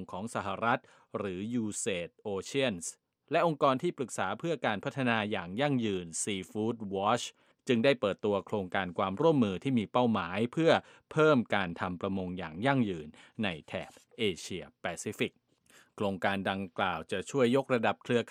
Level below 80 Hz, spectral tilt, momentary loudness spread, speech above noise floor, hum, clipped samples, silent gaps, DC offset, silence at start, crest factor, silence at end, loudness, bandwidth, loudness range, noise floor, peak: -70 dBFS; -5 dB/octave; 11 LU; 32 dB; none; under 0.1%; none; under 0.1%; 0 s; 22 dB; 0 s; -32 LUFS; 15 kHz; 6 LU; -63 dBFS; -10 dBFS